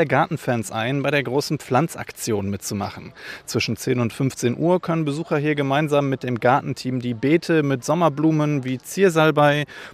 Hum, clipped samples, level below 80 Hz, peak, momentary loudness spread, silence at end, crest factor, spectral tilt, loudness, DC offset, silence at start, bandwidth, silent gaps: none; under 0.1%; -60 dBFS; -2 dBFS; 9 LU; 0 s; 18 dB; -6 dB/octave; -21 LUFS; under 0.1%; 0 s; 15.5 kHz; none